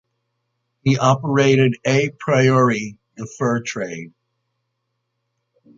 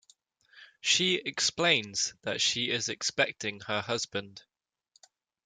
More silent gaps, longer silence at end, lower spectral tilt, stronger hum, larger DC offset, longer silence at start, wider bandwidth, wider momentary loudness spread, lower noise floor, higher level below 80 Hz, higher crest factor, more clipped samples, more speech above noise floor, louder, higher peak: neither; first, 1.7 s vs 1.05 s; first, -6 dB/octave vs -1.5 dB/octave; neither; neither; first, 0.85 s vs 0.55 s; second, 7.6 kHz vs 13 kHz; first, 17 LU vs 10 LU; first, -75 dBFS vs -70 dBFS; first, -60 dBFS vs -72 dBFS; about the same, 18 dB vs 22 dB; neither; first, 57 dB vs 40 dB; first, -18 LUFS vs -28 LUFS; first, -2 dBFS vs -10 dBFS